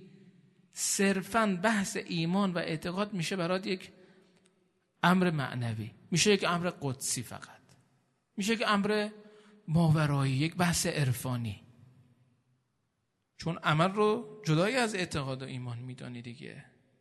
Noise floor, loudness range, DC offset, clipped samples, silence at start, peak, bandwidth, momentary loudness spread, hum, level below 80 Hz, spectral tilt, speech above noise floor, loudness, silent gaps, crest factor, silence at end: -80 dBFS; 4 LU; under 0.1%; under 0.1%; 0 s; -10 dBFS; 12.5 kHz; 16 LU; none; -64 dBFS; -4.5 dB/octave; 49 dB; -30 LUFS; none; 22 dB; 0.4 s